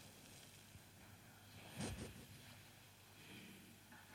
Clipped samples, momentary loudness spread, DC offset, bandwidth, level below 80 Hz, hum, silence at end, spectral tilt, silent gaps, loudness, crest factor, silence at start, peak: under 0.1%; 12 LU; under 0.1%; 16.5 kHz; -70 dBFS; none; 0 s; -4 dB/octave; none; -57 LUFS; 22 dB; 0 s; -36 dBFS